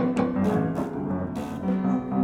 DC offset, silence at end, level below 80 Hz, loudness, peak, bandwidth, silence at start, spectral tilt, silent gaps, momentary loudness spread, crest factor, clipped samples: under 0.1%; 0 s; -52 dBFS; -27 LUFS; -10 dBFS; 11.5 kHz; 0 s; -8.5 dB/octave; none; 6 LU; 14 dB; under 0.1%